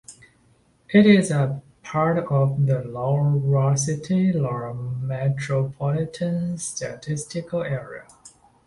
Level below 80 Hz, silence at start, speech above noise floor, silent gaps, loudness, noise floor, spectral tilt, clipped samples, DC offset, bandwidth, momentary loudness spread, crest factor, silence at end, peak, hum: -56 dBFS; 0.1 s; 38 dB; none; -23 LUFS; -60 dBFS; -6.5 dB/octave; under 0.1%; under 0.1%; 11.5 kHz; 12 LU; 18 dB; 0.4 s; -4 dBFS; none